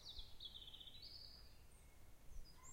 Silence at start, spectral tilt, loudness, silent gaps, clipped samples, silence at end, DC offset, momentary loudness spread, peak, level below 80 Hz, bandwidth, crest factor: 0 s; -2 dB/octave; -58 LUFS; none; under 0.1%; 0 s; under 0.1%; 13 LU; -40 dBFS; -62 dBFS; 16 kHz; 18 dB